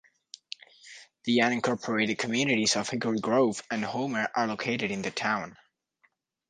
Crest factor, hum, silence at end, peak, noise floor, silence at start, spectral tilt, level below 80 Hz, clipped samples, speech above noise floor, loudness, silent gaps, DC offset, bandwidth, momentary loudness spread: 18 dB; none; 0.95 s; -10 dBFS; -71 dBFS; 0.85 s; -3.5 dB/octave; -70 dBFS; under 0.1%; 43 dB; -28 LUFS; none; under 0.1%; 10 kHz; 19 LU